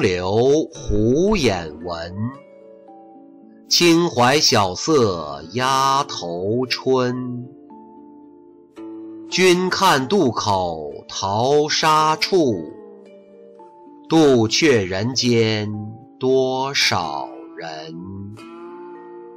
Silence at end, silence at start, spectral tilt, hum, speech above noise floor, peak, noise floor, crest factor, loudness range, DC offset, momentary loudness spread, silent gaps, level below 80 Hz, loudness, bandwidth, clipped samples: 0 s; 0 s; -4 dB/octave; none; 28 dB; -6 dBFS; -46 dBFS; 14 dB; 5 LU; under 0.1%; 20 LU; none; -44 dBFS; -18 LUFS; 16 kHz; under 0.1%